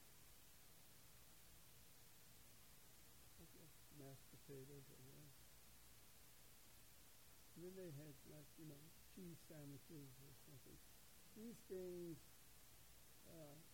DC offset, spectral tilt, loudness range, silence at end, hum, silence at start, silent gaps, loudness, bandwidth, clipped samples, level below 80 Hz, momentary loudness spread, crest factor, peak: under 0.1%; -4.5 dB/octave; 6 LU; 0 s; none; 0 s; none; -62 LUFS; 16.5 kHz; under 0.1%; -76 dBFS; 9 LU; 20 dB; -44 dBFS